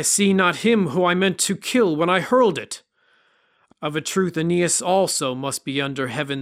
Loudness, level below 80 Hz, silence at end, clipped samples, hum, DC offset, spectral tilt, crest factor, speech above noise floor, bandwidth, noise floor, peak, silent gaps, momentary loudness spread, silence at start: -20 LUFS; -64 dBFS; 0 s; under 0.1%; none; under 0.1%; -4 dB/octave; 18 dB; 42 dB; 16 kHz; -62 dBFS; -4 dBFS; none; 9 LU; 0 s